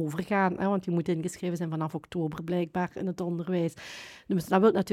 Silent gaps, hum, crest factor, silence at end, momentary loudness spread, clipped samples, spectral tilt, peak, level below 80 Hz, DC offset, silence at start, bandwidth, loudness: none; none; 20 dB; 0 s; 9 LU; under 0.1%; -7 dB/octave; -8 dBFS; -64 dBFS; under 0.1%; 0 s; 15.5 kHz; -29 LUFS